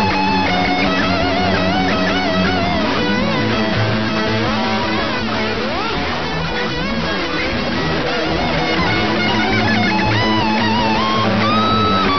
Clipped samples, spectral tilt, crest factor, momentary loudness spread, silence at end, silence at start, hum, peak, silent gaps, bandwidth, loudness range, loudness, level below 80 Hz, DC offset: under 0.1%; -5.5 dB/octave; 14 dB; 4 LU; 0 s; 0 s; none; -2 dBFS; none; 6.4 kHz; 4 LU; -16 LUFS; -34 dBFS; 3%